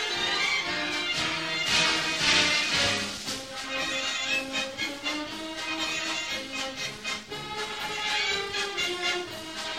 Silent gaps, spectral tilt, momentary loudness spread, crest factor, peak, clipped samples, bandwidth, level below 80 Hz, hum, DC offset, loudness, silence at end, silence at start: none; -1 dB/octave; 11 LU; 20 dB; -10 dBFS; under 0.1%; 16 kHz; -58 dBFS; none; 0.1%; -27 LUFS; 0 s; 0 s